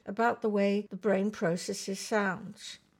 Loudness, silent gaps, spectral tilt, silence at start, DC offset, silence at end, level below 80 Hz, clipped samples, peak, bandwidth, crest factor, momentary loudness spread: -31 LUFS; none; -5 dB/octave; 0.05 s; under 0.1%; 0.25 s; -76 dBFS; under 0.1%; -16 dBFS; 16 kHz; 16 dB; 9 LU